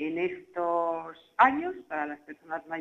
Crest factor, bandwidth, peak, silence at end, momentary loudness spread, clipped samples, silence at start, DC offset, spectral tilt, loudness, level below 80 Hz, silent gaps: 22 dB; 7.6 kHz; -6 dBFS; 0 s; 15 LU; under 0.1%; 0 s; under 0.1%; -6.5 dB/octave; -29 LUFS; -72 dBFS; none